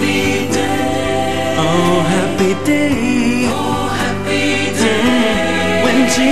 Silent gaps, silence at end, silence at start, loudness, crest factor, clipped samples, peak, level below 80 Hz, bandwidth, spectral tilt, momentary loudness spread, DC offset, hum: none; 0 s; 0 s; -14 LUFS; 12 dB; under 0.1%; -2 dBFS; -38 dBFS; 14 kHz; -4.5 dB/octave; 4 LU; 4%; none